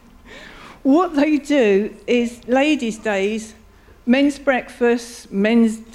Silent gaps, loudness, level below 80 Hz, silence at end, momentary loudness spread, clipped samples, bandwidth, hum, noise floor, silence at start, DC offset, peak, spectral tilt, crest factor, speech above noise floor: none; -18 LUFS; -50 dBFS; 0.1 s; 13 LU; under 0.1%; 12.5 kHz; none; -41 dBFS; 0.3 s; under 0.1%; -4 dBFS; -5 dB/octave; 16 dB; 23 dB